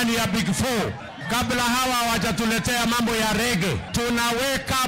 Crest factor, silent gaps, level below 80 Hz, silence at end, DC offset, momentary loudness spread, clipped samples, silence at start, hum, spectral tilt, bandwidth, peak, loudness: 12 dB; none; -42 dBFS; 0 s; under 0.1%; 4 LU; under 0.1%; 0 s; none; -3.5 dB/octave; 16.5 kHz; -12 dBFS; -22 LUFS